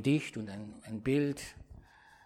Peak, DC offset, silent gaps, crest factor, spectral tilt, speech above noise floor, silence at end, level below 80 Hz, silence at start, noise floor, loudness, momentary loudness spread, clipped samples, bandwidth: -18 dBFS; under 0.1%; none; 16 dB; -6.5 dB/octave; 24 dB; 0.45 s; -60 dBFS; 0 s; -57 dBFS; -35 LUFS; 19 LU; under 0.1%; 14 kHz